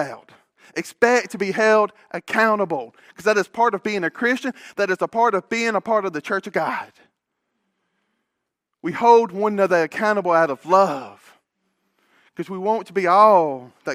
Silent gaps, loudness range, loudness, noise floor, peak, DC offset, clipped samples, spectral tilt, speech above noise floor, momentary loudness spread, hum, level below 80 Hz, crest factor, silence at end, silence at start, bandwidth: none; 5 LU; -19 LUFS; -80 dBFS; -2 dBFS; under 0.1%; under 0.1%; -5 dB/octave; 60 dB; 15 LU; none; -72 dBFS; 20 dB; 0 s; 0 s; 15.5 kHz